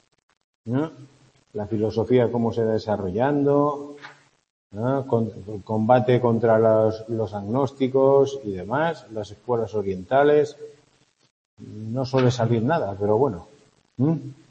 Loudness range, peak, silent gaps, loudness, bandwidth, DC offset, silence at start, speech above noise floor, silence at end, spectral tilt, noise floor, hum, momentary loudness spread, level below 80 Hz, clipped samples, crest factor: 4 LU; -2 dBFS; 4.50-4.70 s, 11.30-11.57 s; -22 LUFS; 8.2 kHz; under 0.1%; 0.65 s; 40 dB; 0.2 s; -8 dB/octave; -62 dBFS; none; 16 LU; -60 dBFS; under 0.1%; 20 dB